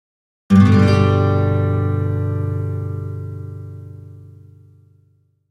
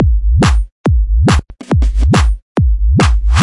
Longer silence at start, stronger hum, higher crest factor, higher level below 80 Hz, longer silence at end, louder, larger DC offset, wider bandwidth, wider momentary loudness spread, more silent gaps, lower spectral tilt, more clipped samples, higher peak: first, 0.5 s vs 0 s; neither; first, 18 dB vs 10 dB; second, -48 dBFS vs -12 dBFS; first, 1.25 s vs 0 s; second, -17 LUFS vs -13 LUFS; neither; second, 7.4 kHz vs 11.5 kHz; first, 22 LU vs 4 LU; second, none vs 0.72-0.84 s, 2.42-2.55 s; first, -8.5 dB/octave vs -6 dB/octave; neither; about the same, 0 dBFS vs 0 dBFS